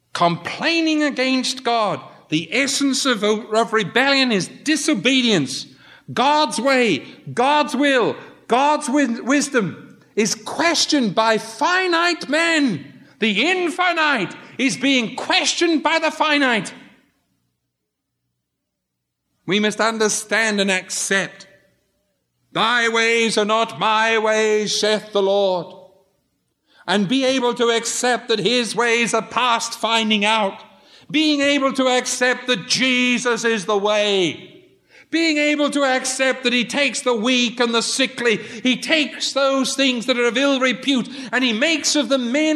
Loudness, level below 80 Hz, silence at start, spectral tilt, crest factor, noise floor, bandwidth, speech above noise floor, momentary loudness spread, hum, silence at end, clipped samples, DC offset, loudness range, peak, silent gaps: -18 LUFS; -76 dBFS; 0.15 s; -2.5 dB/octave; 18 dB; -78 dBFS; 13.5 kHz; 59 dB; 6 LU; none; 0 s; under 0.1%; under 0.1%; 3 LU; -2 dBFS; none